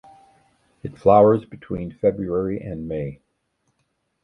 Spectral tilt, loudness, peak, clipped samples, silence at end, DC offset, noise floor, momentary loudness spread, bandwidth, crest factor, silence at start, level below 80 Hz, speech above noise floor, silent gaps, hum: -10.5 dB/octave; -21 LUFS; -2 dBFS; under 0.1%; 1.1 s; under 0.1%; -72 dBFS; 18 LU; 5.6 kHz; 22 dB; 0.85 s; -50 dBFS; 52 dB; none; none